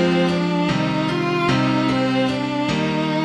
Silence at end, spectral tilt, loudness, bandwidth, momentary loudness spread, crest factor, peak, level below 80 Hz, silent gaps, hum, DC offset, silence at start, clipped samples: 0 s; -6.5 dB/octave; -20 LUFS; 10.5 kHz; 3 LU; 12 dB; -6 dBFS; -48 dBFS; none; none; under 0.1%; 0 s; under 0.1%